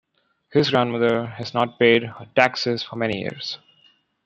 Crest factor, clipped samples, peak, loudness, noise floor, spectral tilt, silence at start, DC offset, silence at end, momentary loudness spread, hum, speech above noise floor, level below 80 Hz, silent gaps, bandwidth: 20 dB; under 0.1%; -2 dBFS; -21 LUFS; -60 dBFS; -5.5 dB/octave; 0.5 s; under 0.1%; 0.7 s; 11 LU; none; 39 dB; -64 dBFS; none; 8.2 kHz